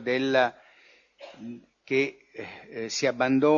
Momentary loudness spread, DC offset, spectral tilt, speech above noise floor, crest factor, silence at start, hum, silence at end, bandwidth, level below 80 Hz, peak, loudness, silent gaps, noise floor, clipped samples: 20 LU; under 0.1%; -4.5 dB/octave; 33 dB; 18 dB; 0 s; none; 0 s; 7.4 kHz; -72 dBFS; -10 dBFS; -26 LUFS; none; -59 dBFS; under 0.1%